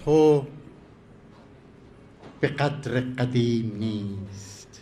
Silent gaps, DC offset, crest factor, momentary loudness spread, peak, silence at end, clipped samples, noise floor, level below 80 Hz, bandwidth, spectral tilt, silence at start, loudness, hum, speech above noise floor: none; under 0.1%; 20 dB; 21 LU; -8 dBFS; 0.05 s; under 0.1%; -50 dBFS; -56 dBFS; 11 kHz; -7 dB/octave; 0 s; -25 LUFS; none; 26 dB